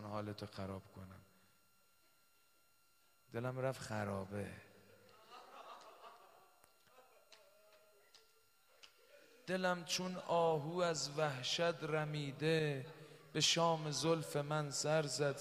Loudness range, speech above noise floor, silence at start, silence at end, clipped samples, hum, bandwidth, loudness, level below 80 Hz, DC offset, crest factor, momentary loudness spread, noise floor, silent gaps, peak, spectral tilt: 19 LU; 36 dB; 0 s; 0 s; under 0.1%; none; 15.5 kHz; -39 LUFS; -78 dBFS; under 0.1%; 22 dB; 22 LU; -75 dBFS; none; -20 dBFS; -4 dB/octave